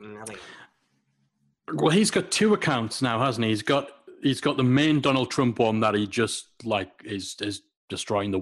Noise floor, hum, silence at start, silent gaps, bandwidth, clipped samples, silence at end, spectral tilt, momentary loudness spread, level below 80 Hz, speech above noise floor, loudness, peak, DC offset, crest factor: -71 dBFS; none; 0 s; 7.77-7.88 s; 12.5 kHz; under 0.1%; 0 s; -5 dB/octave; 14 LU; -62 dBFS; 46 dB; -24 LUFS; -8 dBFS; under 0.1%; 16 dB